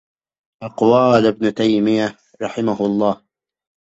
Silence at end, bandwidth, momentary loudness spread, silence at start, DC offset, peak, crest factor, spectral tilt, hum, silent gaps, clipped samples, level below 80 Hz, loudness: 0.85 s; 8 kHz; 16 LU; 0.6 s; under 0.1%; -2 dBFS; 16 dB; -7 dB/octave; none; none; under 0.1%; -58 dBFS; -17 LUFS